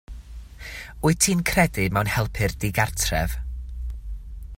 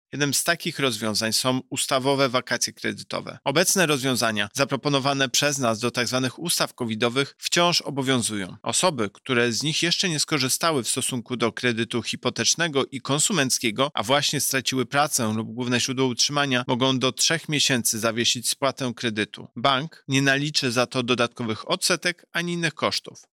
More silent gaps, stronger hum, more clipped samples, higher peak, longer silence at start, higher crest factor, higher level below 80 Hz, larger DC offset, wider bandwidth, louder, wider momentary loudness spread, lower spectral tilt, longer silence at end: neither; neither; neither; first, -2 dBFS vs -8 dBFS; about the same, 0.1 s vs 0.15 s; first, 22 dB vs 16 dB; first, -34 dBFS vs -70 dBFS; neither; about the same, 16.5 kHz vs 17.5 kHz; about the same, -23 LUFS vs -23 LUFS; first, 19 LU vs 6 LU; about the same, -4 dB/octave vs -3 dB/octave; second, 0 s vs 0.15 s